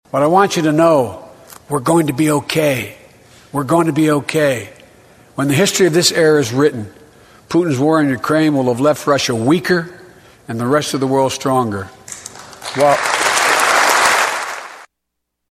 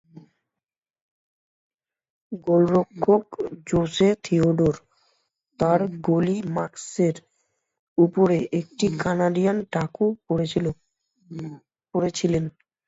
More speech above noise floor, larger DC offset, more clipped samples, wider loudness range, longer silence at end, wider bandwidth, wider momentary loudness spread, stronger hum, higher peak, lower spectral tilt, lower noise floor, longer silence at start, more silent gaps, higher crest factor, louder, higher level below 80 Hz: second, 61 dB vs 67 dB; neither; neither; about the same, 3 LU vs 4 LU; first, 0.7 s vs 0.35 s; first, 16 kHz vs 8 kHz; first, 17 LU vs 14 LU; neither; first, 0 dBFS vs -6 dBFS; second, -4.5 dB/octave vs -7 dB/octave; second, -76 dBFS vs -90 dBFS; second, 0.15 s vs 2.3 s; second, none vs 7.79-7.96 s; about the same, 16 dB vs 18 dB; first, -14 LUFS vs -23 LUFS; about the same, -54 dBFS vs -54 dBFS